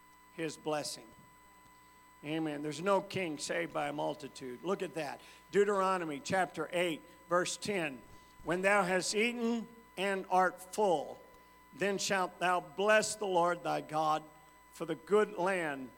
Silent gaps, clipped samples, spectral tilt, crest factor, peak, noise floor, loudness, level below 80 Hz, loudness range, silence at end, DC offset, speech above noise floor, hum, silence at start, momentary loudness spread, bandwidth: none; under 0.1%; -3.5 dB/octave; 20 dB; -14 dBFS; -60 dBFS; -34 LUFS; -72 dBFS; 5 LU; 0.05 s; under 0.1%; 27 dB; none; 0.35 s; 13 LU; 18 kHz